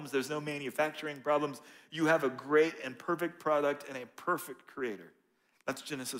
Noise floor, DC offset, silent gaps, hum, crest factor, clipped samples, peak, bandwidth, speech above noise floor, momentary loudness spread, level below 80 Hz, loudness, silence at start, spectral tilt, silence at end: -72 dBFS; under 0.1%; none; none; 18 dB; under 0.1%; -16 dBFS; 16 kHz; 39 dB; 13 LU; -82 dBFS; -33 LUFS; 0 s; -4.5 dB/octave; 0 s